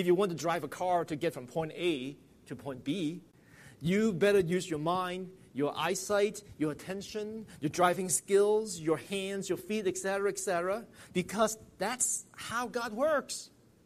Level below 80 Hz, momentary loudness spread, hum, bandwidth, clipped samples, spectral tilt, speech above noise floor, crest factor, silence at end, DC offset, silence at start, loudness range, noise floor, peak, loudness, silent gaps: -66 dBFS; 12 LU; none; 15 kHz; under 0.1%; -4 dB/octave; 25 dB; 20 dB; 0.4 s; under 0.1%; 0 s; 3 LU; -56 dBFS; -12 dBFS; -32 LUFS; none